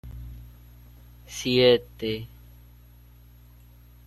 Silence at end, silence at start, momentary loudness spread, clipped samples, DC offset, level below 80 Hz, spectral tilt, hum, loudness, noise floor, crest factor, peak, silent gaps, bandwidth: 1.8 s; 0.05 s; 25 LU; under 0.1%; under 0.1%; -48 dBFS; -4.5 dB/octave; 60 Hz at -50 dBFS; -23 LUFS; -51 dBFS; 22 dB; -6 dBFS; none; 13 kHz